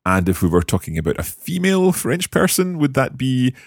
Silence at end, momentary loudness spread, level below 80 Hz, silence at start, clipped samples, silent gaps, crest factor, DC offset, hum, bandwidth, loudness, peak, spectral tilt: 0.15 s; 6 LU; -40 dBFS; 0.05 s; under 0.1%; none; 18 dB; under 0.1%; none; 18.5 kHz; -18 LUFS; 0 dBFS; -5.5 dB/octave